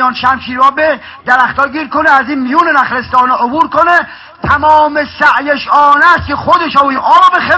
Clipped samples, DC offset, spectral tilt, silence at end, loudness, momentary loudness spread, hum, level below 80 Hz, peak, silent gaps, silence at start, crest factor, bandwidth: 2%; under 0.1%; -5 dB/octave; 0 s; -9 LUFS; 6 LU; none; -38 dBFS; 0 dBFS; none; 0 s; 10 dB; 8 kHz